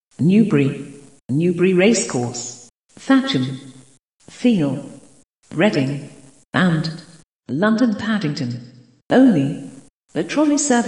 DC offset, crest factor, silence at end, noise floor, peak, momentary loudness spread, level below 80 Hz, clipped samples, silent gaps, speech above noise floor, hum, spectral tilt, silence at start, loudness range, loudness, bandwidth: 0.1%; 18 dB; 0 s; -51 dBFS; -2 dBFS; 17 LU; -62 dBFS; under 0.1%; 1.21-1.29 s, 2.75-2.82 s, 4.05-4.18 s, 5.24-5.42 s, 6.45-6.49 s, 7.33-7.37 s, 9.06-9.10 s, 9.90-10.08 s; 34 dB; none; -5.5 dB/octave; 0.2 s; 3 LU; -18 LUFS; 11 kHz